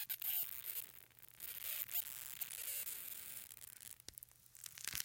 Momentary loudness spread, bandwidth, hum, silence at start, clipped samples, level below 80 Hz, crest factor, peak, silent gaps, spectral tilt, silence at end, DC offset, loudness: 15 LU; 17 kHz; none; 0 s; under 0.1%; -78 dBFS; 32 dB; -16 dBFS; none; 1 dB/octave; 0 s; under 0.1%; -44 LUFS